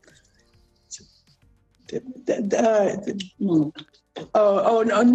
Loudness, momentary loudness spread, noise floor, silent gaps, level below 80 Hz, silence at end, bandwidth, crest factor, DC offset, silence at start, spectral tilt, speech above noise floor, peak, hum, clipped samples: -22 LUFS; 22 LU; -60 dBFS; none; -66 dBFS; 0 s; 8.6 kHz; 14 dB; under 0.1%; 0.9 s; -6 dB/octave; 39 dB; -8 dBFS; none; under 0.1%